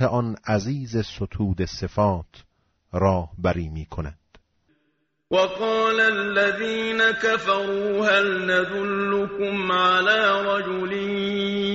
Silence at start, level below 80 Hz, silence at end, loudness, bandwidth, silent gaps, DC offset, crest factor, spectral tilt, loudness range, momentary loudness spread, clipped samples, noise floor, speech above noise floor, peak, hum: 0 s; -46 dBFS; 0 s; -22 LUFS; 8 kHz; none; under 0.1%; 16 dB; -3 dB/octave; 6 LU; 9 LU; under 0.1%; -71 dBFS; 49 dB; -6 dBFS; none